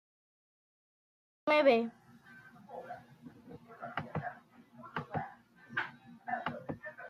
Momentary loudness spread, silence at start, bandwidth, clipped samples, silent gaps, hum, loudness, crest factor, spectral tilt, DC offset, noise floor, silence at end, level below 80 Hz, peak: 27 LU; 1.45 s; 13 kHz; under 0.1%; none; none; -35 LUFS; 24 dB; -6.5 dB/octave; under 0.1%; -58 dBFS; 0 s; -76 dBFS; -14 dBFS